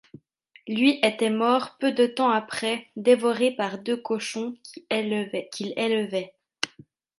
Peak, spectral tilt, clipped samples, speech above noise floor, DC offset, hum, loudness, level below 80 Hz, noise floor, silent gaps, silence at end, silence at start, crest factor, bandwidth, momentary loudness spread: -4 dBFS; -4 dB/octave; under 0.1%; 34 dB; under 0.1%; none; -25 LUFS; -76 dBFS; -58 dBFS; none; 0.55 s; 0.65 s; 22 dB; 11.5 kHz; 11 LU